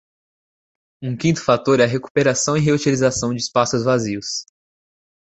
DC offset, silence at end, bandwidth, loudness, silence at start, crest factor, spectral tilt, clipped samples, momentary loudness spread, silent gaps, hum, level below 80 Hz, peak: under 0.1%; 0.8 s; 8.4 kHz; -19 LUFS; 1 s; 18 dB; -4.5 dB/octave; under 0.1%; 9 LU; 2.10-2.15 s; none; -52 dBFS; -2 dBFS